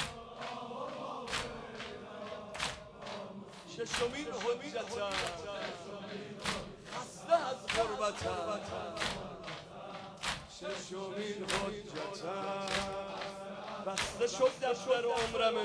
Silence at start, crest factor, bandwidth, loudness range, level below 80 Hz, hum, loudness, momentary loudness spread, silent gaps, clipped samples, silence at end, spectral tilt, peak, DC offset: 0 s; 20 dB; 11 kHz; 5 LU; -60 dBFS; none; -37 LUFS; 13 LU; none; under 0.1%; 0 s; -3 dB/octave; -16 dBFS; under 0.1%